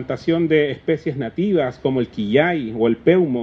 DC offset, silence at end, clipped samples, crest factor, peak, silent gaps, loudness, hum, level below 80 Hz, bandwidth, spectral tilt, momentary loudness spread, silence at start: under 0.1%; 0 s; under 0.1%; 16 dB; -2 dBFS; none; -19 LUFS; none; -52 dBFS; 6.6 kHz; -8.5 dB/octave; 6 LU; 0 s